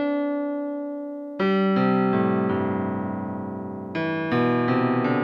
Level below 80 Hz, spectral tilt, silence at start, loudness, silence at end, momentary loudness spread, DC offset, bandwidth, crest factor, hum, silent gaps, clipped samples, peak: -68 dBFS; -9.5 dB/octave; 0 s; -24 LUFS; 0 s; 11 LU; under 0.1%; 5.8 kHz; 14 dB; none; none; under 0.1%; -8 dBFS